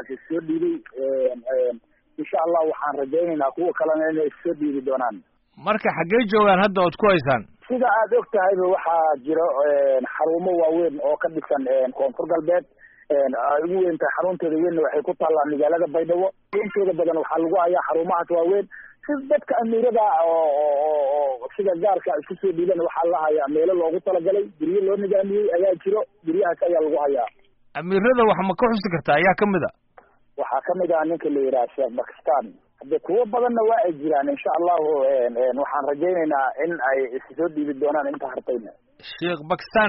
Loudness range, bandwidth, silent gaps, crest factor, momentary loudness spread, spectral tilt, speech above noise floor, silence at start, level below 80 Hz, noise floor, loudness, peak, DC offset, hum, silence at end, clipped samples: 3 LU; 4.5 kHz; none; 14 dB; 7 LU; -4.5 dB/octave; 32 dB; 0 s; -60 dBFS; -54 dBFS; -22 LUFS; -6 dBFS; under 0.1%; none; 0 s; under 0.1%